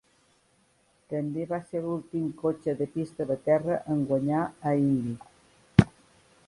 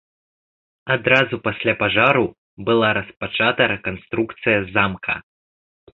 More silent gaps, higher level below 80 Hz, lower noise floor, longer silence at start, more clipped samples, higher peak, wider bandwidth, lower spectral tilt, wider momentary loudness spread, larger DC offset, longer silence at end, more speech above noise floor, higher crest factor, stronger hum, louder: second, none vs 2.38-2.57 s; about the same, -50 dBFS vs -50 dBFS; second, -66 dBFS vs under -90 dBFS; first, 1.1 s vs 0.85 s; neither; about the same, 0 dBFS vs -2 dBFS; first, 11.5 kHz vs 7.2 kHz; first, -8.5 dB/octave vs -7 dB/octave; about the same, 10 LU vs 10 LU; neither; second, 0.6 s vs 0.75 s; second, 38 dB vs over 71 dB; first, 28 dB vs 20 dB; neither; second, -28 LUFS vs -19 LUFS